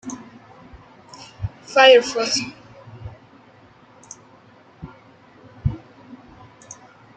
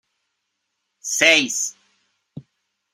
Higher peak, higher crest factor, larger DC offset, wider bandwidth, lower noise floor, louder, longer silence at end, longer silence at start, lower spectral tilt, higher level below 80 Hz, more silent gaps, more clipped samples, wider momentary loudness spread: about the same, -2 dBFS vs -2 dBFS; about the same, 22 dB vs 24 dB; neither; second, 9 kHz vs 16 kHz; second, -50 dBFS vs -76 dBFS; about the same, -17 LUFS vs -17 LUFS; about the same, 0.45 s vs 0.55 s; second, 0.05 s vs 1.05 s; first, -3.5 dB/octave vs -0.5 dB/octave; first, -46 dBFS vs -74 dBFS; neither; neither; first, 30 LU vs 14 LU